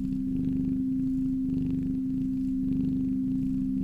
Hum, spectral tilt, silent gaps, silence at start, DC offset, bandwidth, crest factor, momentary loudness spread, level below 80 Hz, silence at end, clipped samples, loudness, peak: none; -10.5 dB/octave; none; 0 s; under 0.1%; 3.1 kHz; 12 dB; 1 LU; -42 dBFS; 0 s; under 0.1%; -29 LUFS; -16 dBFS